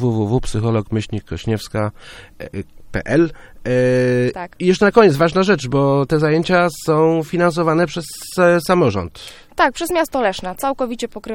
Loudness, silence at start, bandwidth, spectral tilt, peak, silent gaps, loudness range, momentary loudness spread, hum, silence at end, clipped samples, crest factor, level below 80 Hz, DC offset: -17 LUFS; 0 s; 17 kHz; -6 dB/octave; 0 dBFS; none; 6 LU; 13 LU; none; 0 s; under 0.1%; 18 dB; -40 dBFS; under 0.1%